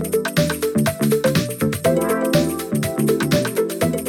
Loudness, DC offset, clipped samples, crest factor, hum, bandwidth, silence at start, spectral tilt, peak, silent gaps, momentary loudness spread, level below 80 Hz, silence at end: -19 LUFS; under 0.1%; under 0.1%; 14 dB; none; 19 kHz; 0 s; -5 dB/octave; -4 dBFS; none; 4 LU; -46 dBFS; 0 s